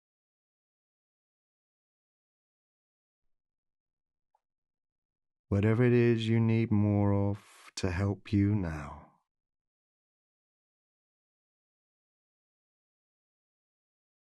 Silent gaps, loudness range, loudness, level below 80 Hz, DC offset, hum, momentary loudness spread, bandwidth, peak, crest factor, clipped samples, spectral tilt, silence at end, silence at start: none; 9 LU; -29 LUFS; -58 dBFS; under 0.1%; none; 14 LU; 10.5 kHz; -16 dBFS; 18 dB; under 0.1%; -8 dB/octave; 5.4 s; 5.5 s